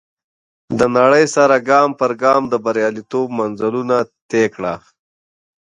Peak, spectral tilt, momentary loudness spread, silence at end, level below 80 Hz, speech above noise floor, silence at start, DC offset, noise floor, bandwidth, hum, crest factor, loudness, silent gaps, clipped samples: 0 dBFS; -5 dB/octave; 10 LU; 0.85 s; -56 dBFS; over 75 dB; 0.7 s; under 0.1%; under -90 dBFS; 10.5 kHz; none; 16 dB; -16 LUFS; 4.22-4.29 s; under 0.1%